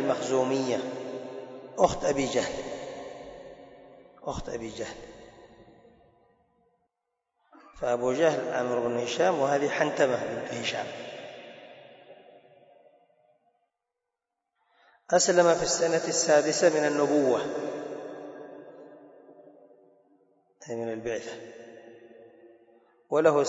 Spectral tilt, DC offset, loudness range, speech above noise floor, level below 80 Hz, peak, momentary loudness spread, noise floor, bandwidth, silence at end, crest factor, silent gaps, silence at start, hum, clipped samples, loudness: -3.5 dB/octave; under 0.1%; 17 LU; 60 dB; -60 dBFS; -8 dBFS; 23 LU; -86 dBFS; 8 kHz; 0 s; 22 dB; none; 0 s; none; under 0.1%; -27 LUFS